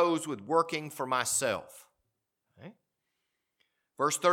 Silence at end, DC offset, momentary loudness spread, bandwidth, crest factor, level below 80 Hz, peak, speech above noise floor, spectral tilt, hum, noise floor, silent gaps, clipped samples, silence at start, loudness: 0 s; under 0.1%; 8 LU; 18 kHz; 22 dB; -78 dBFS; -12 dBFS; 53 dB; -3 dB/octave; none; -83 dBFS; none; under 0.1%; 0 s; -30 LUFS